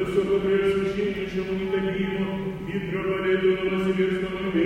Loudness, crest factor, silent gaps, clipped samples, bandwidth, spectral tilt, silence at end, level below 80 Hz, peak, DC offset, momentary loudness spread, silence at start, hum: -25 LUFS; 14 dB; none; under 0.1%; 10 kHz; -7.5 dB/octave; 0 s; -48 dBFS; -10 dBFS; under 0.1%; 7 LU; 0 s; none